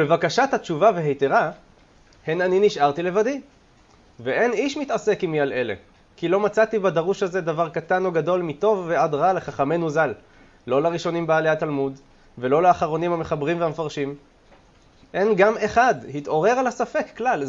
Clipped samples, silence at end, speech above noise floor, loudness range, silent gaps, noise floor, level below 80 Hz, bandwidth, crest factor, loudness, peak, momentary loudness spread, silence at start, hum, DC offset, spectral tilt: under 0.1%; 0 s; 33 dB; 2 LU; none; -54 dBFS; -56 dBFS; 7.8 kHz; 18 dB; -22 LUFS; -4 dBFS; 9 LU; 0 s; none; under 0.1%; -6 dB/octave